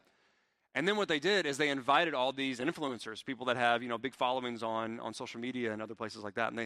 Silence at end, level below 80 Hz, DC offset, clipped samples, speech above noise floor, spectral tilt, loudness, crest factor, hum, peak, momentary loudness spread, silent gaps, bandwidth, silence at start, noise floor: 0 s; -78 dBFS; under 0.1%; under 0.1%; 41 dB; -4 dB/octave; -34 LUFS; 22 dB; none; -12 dBFS; 12 LU; none; 14 kHz; 0.75 s; -74 dBFS